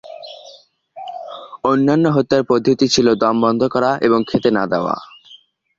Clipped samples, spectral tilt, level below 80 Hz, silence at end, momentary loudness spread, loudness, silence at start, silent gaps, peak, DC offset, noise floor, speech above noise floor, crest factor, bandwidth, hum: under 0.1%; -5.5 dB/octave; -54 dBFS; 0.4 s; 19 LU; -16 LUFS; 0.05 s; none; 0 dBFS; under 0.1%; -47 dBFS; 32 dB; 16 dB; 7.8 kHz; none